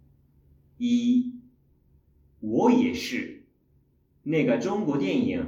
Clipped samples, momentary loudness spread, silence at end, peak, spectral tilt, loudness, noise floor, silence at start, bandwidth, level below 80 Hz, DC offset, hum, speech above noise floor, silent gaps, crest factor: under 0.1%; 16 LU; 0 s; -8 dBFS; -6 dB/octave; -25 LUFS; -64 dBFS; 0.8 s; 13 kHz; -62 dBFS; under 0.1%; none; 40 dB; none; 18 dB